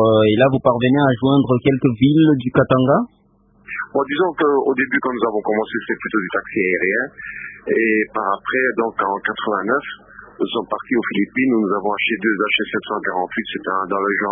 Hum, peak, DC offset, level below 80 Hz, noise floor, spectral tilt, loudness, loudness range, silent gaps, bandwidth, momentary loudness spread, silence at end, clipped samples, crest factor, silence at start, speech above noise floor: none; 0 dBFS; under 0.1%; -52 dBFS; -55 dBFS; -11.5 dB/octave; -18 LUFS; 4 LU; none; 3.8 kHz; 9 LU; 0 s; under 0.1%; 18 dB; 0 s; 37 dB